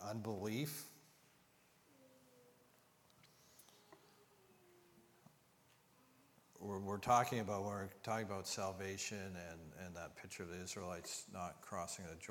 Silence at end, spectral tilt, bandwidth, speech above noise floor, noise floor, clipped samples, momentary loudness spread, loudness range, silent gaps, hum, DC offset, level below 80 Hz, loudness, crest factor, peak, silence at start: 0 s; -4 dB/octave; 19 kHz; 28 dB; -72 dBFS; under 0.1%; 23 LU; 12 LU; none; none; under 0.1%; -76 dBFS; -44 LUFS; 26 dB; -20 dBFS; 0 s